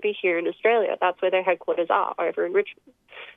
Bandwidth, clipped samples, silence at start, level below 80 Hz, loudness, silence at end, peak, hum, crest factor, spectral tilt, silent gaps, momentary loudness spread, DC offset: 3.9 kHz; under 0.1%; 0 s; -76 dBFS; -23 LUFS; 0.05 s; -8 dBFS; none; 16 dB; -6.5 dB/octave; none; 5 LU; under 0.1%